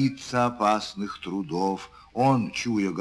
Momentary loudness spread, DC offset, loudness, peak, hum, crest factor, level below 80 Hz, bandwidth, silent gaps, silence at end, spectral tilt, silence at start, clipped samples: 10 LU; under 0.1%; -26 LUFS; -8 dBFS; none; 18 dB; -58 dBFS; 11 kHz; none; 0 s; -5.5 dB/octave; 0 s; under 0.1%